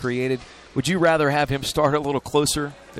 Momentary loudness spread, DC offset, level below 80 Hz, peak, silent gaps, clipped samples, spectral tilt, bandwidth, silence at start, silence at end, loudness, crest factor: 8 LU; under 0.1%; -46 dBFS; -8 dBFS; none; under 0.1%; -4.5 dB/octave; 16 kHz; 0 s; 0 s; -22 LUFS; 14 dB